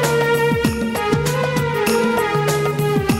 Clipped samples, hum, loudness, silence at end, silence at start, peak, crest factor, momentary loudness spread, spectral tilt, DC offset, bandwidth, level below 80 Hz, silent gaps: under 0.1%; none; -18 LUFS; 0 s; 0 s; -2 dBFS; 14 dB; 3 LU; -5 dB/octave; under 0.1%; 16.5 kHz; -40 dBFS; none